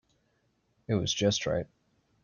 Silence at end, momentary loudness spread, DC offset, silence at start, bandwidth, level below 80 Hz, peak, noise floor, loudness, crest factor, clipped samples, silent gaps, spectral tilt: 0.6 s; 7 LU; under 0.1%; 0.9 s; 7.4 kHz; -58 dBFS; -14 dBFS; -73 dBFS; -30 LUFS; 20 dB; under 0.1%; none; -4.5 dB/octave